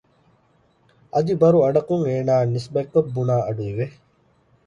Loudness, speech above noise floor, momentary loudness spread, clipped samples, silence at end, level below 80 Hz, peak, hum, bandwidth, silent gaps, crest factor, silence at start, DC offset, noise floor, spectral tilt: -21 LUFS; 41 dB; 10 LU; under 0.1%; 0.75 s; -56 dBFS; -4 dBFS; none; 9.4 kHz; none; 16 dB; 1.15 s; under 0.1%; -61 dBFS; -9 dB/octave